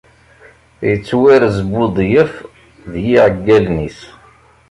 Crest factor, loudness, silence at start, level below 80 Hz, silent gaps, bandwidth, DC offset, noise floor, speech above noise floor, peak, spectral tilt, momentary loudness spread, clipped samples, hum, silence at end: 14 dB; -13 LUFS; 0.8 s; -38 dBFS; none; 11 kHz; under 0.1%; -46 dBFS; 34 dB; -2 dBFS; -7.5 dB/octave; 12 LU; under 0.1%; none; 0.65 s